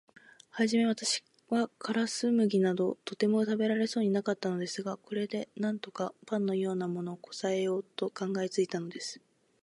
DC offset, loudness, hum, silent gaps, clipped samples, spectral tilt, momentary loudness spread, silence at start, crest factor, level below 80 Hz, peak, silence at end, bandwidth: under 0.1%; -32 LUFS; none; none; under 0.1%; -5 dB/octave; 10 LU; 0.55 s; 16 dB; -80 dBFS; -14 dBFS; 0.45 s; 11.5 kHz